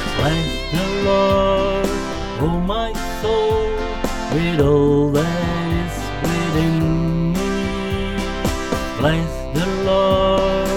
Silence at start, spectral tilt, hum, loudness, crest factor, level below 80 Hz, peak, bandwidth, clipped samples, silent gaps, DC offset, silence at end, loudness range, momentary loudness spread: 0 s; -6 dB/octave; none; -19 LUFS; 14 dB; -28 dBFS; -4 dBFS; 17 kHz; under 0.1%; none; 1%; 0 s; 2 LU; 8 LU